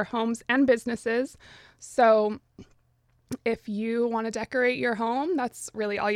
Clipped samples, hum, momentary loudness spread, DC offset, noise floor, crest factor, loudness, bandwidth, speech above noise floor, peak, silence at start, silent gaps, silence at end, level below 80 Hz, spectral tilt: under 0.1%; none; 11 LU; under 0.1%; -66 dBFS; 18 dB; -26 LUFS; 15 kHz; 40 dB; -10 dBFS; 0 s; none; 0 s; -64 dBFS; -4.5 dB/octave